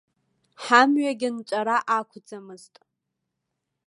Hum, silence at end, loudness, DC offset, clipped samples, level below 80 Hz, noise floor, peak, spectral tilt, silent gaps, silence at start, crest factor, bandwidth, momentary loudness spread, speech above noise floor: none; 1.3 s; -22 LUFS; under 0.1%; under 0.1%; -84 dBFS; -81 dBFS; -2 dBFS; -3 dB/octave; none; 0.6 s; 24 dB; 11.5 kHz; 24 LU; 58 dB